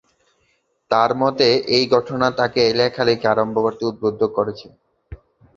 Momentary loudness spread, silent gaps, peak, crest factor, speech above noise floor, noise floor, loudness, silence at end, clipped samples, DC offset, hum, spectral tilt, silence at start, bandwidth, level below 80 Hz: 6 LU; none; -2 dBFS; 18 dB; 47 dB; -65 dBFS; -18 LUFS; 0.4 s; under 0.1%; under 0.1%; none; -5 dB/octave; 0.9 s; 7.4 kHz; -52 dBFS